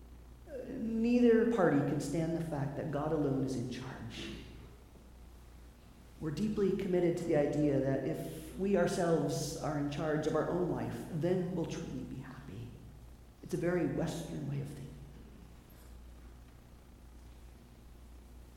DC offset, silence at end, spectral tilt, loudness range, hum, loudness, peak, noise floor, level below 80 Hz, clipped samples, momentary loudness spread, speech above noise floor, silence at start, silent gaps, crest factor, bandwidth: under 0.1%; 0 s; -7 dB/octave; 11 LU; 60 Hz at -55 dBFS; -34 LUFS; -16 dBFS; -56 dBFS; -54 dBFS; under 0.1%; 24 LU; 22 dB; 0 s; none; 20 dB; 16.5 kHz